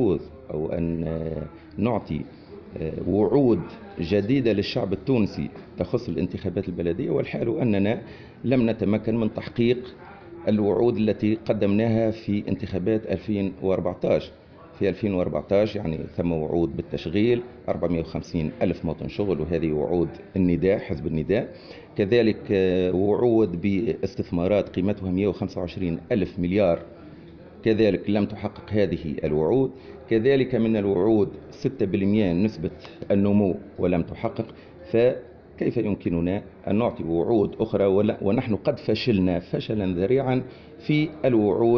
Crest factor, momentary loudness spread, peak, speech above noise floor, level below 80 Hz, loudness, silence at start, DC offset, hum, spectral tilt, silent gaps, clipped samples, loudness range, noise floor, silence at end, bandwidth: 16 dB; 10 LU; -8 dBFS; 21 dB; -48 dBFS; -24 LUFS; 0 s; under 0.1%; none; -7 dB/octave; none; under 0.1%; 3 LU; -44 dBFS; 0 s; 6.6 kHz